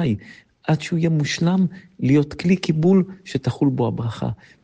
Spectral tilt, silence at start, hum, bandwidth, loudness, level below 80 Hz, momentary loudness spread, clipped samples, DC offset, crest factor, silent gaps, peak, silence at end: -7 dB/octave; 0 s; none; 9 kHz; -21 LUFS; -52 dBFS; 9 LU; under 0.1%; under 0.1%; 14 dB; none; -6 dBFS; 0.3 s